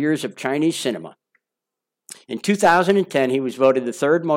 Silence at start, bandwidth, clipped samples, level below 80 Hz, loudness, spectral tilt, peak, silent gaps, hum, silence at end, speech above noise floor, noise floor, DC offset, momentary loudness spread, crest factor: 0 s; 16.5 kHz; under 0.1%; -64 dBFS; -19 LUFS; -5 dB/octave; -4 dBFS; none; none; 0 s; 66 dB; -85 dBFS; under 0.1%; 11 LU; 16 dB